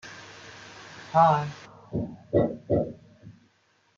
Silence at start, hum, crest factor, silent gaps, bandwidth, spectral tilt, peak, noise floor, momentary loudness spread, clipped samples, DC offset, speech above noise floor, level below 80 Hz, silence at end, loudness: 0.05 s; none; 22 dB; none; 7.6 kHz; -7.5 dB/octave; -6 dBFS; -66 dBFS; 23 LU; under 0.1%; under 0.1%; 42 dB; -56 dBFS; 0.65 s; -26 LUFS